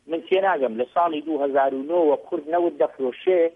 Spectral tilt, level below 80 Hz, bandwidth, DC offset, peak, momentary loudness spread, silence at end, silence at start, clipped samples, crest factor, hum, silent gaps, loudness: -7 dB/octave; -74 dBFS; 3.8 kHz; under 0.1%; -8 dBFS; 4 LU; 0.05 s; 0.1 s; under 0.1%; 14 dB; none; none; -22 LUFS